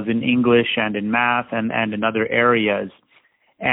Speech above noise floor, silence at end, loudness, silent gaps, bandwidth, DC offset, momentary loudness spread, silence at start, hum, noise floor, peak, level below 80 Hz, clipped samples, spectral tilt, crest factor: 40 dB; 0 s; -19 LUFS; none; 4 kHz; under 0.1%; 7 LU; 0 s; none; -59 dBFS; -4 dBFS; -58 dBFS; under 0.1%; -10.5 dB/octave; 16 dB